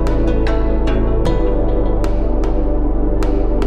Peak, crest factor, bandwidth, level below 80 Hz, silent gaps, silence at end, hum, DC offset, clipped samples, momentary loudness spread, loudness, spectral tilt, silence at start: -4 dBFS; 10 dB; 7.2 kHz; -16 dBFS; none; 0 s; none; under 0.1%; under 0.1%; 2 LU; -18 LUFS; -8 dB/octave; 0 s